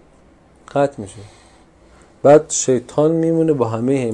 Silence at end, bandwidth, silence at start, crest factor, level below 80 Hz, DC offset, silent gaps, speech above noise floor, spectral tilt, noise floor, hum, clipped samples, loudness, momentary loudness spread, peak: 0 s; 10.5 kHz; 0.75 s; 18 dB; -54 dBFS; under 0.1%; none; 34 dB; -5.5 dB/octave; -49 dBFS; none; under 0.1%; -16 LUFS; 11 LU; 0 dBFS